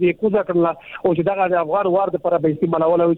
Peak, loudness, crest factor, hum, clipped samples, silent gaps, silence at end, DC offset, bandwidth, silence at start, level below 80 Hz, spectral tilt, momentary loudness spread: -6 dBFS; -19 LUFS; 12 dB; none; under 0.1%; none; 0 s; under 0.1%; 4.1 kHz; 0 s; -56 dBFS; -10.5 dB/octave; 3 LU